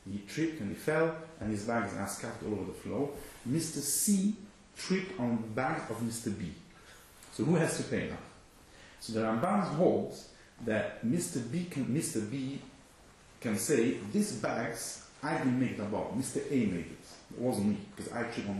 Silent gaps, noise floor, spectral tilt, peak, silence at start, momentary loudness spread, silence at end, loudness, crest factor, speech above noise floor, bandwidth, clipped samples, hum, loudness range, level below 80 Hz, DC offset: none; -58 dBFS; -5 dB/octave; -14 dBFS; 0.05 s; 15 LU; 0 s; -34 LUFS; 20 dB; 25 dB; 13 kHz; under 0.1%; none; 3 LU; -62 dBFS; under 0.1%